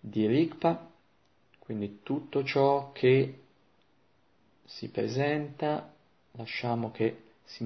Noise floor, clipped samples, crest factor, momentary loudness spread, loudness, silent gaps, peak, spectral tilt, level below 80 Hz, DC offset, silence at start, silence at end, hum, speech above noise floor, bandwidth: -69 dBFS; under 0.1%; 20 dB; 14 LU; -30 LUFS; none; -12 dBFS; -7.5 dB/octave; -70 dBFS; under 0.1%; 0.05 s; 0 s; none; 40 dB; 6.4 kHz